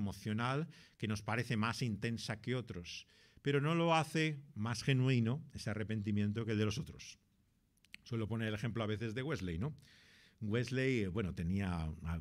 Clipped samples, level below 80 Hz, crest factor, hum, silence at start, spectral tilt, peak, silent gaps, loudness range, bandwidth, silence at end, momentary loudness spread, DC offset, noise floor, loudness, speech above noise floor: under 0.1%; -60 dBFS; 18 dB; none; 0 s; -6 dB/octave; -20 dBFS; none; 5 LU; 14 kHz; 0 s; 12 LU; under 0.1%; -75 dBFS; -38 LUFS; 37 dB